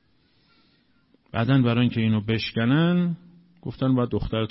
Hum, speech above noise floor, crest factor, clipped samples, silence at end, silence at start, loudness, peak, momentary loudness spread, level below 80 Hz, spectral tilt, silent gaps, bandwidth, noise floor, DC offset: none; 42 dB; 14 dB; under 0.1%; 0.05 s; 1.35 s; -23 LUFS; -10 dBFS; 12 LU; -46 dBFS; -11 dB/octave; none; 5.8 kHz; -64 dBFS; under 0.1%